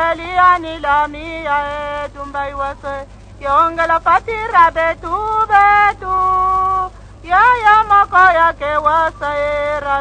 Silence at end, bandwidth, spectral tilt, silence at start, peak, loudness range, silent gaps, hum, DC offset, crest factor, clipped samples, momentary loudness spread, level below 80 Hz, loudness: 0 s; 9.4 kHz; -4.5 dB/octave; 0 s; 0 dBFS; 6 LU; none; 50 Hz at -35 dBFS; under 0.1%; 14 dB; under 0.1%; 13 LU; -36 dBFS; -14 LUFS